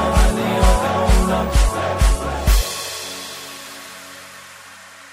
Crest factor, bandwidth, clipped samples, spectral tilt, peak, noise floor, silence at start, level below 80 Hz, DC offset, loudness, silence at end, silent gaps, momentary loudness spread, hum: 16 dB; 16 kHz; under 0.1%; -4.5 dB/octave; -2 dBFS; -41 dBFS; 0 s; -20 dBFS; under 0.1%; -19 LUFS; 0.05 s; none; 20 LU; none